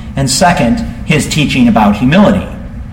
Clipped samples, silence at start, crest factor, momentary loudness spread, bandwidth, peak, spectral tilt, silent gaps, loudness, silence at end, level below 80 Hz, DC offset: under 0.1%; 0 s; 10 dB; 8 LU; 17 kHz; 0 dBFS; -5 dB/octave; none; -10 LUFS; 0 s; -26 dBFS; under 0.1%